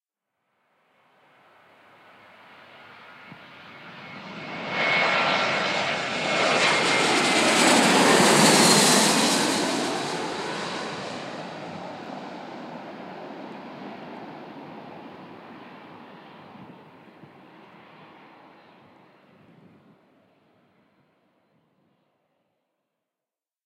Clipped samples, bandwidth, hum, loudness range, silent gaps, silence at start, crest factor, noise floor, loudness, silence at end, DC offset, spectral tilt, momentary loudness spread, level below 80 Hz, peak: under 0.1%; 16 kHz; none; 24 LU; none; 2.9 s; 22 dB; under -90 dBFS; -20 LUFS; 6.9 s; under 0.1%; -2.5 dB/octave; 27 LU; -74 dBFS; -4 dBFS